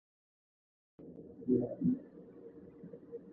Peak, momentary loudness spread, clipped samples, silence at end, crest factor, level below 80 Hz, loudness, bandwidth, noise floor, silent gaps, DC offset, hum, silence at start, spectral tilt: -20 dBFS; 20 LU; under 0.1%; 0 s; 20 dB; -70 dBFS; -35 LUFS; 2 kHz; -54 dBFS; none; under 0.1%; none; 1 s; -13.5 dB/octave